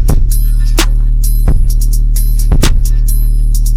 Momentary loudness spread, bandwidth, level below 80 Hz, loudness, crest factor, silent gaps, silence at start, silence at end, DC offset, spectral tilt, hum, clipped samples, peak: 2 LU; 16 kHz; -8 dBFS; -14 LUFS; 8 dB; none; 0 s; 0 s; under 0.1%; -4.5 dB/octave; none; under 0.1%; 0 dBFS